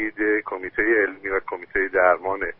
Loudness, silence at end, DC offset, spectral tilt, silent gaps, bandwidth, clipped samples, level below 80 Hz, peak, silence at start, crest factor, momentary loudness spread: -22 LUFS; 0.05 s; under 0.1%; -4 dB/octave; none; 4.1 kHz; under 0.1%; -50 dBFS; -4 dBFS; 0 s; 18 dB; 8 LU